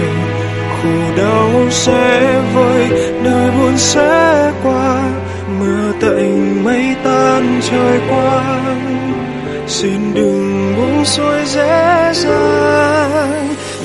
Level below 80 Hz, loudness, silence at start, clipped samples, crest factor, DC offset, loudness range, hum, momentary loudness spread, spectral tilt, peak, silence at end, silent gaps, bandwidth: -42 dBFS; -12 LUFS; 0 s; under 0.1%; 12 dB; under 0.1%; 4 LU; none; 7 LU; -5 dB/octave; 0 dBFS; 0 s; none; 12 kHz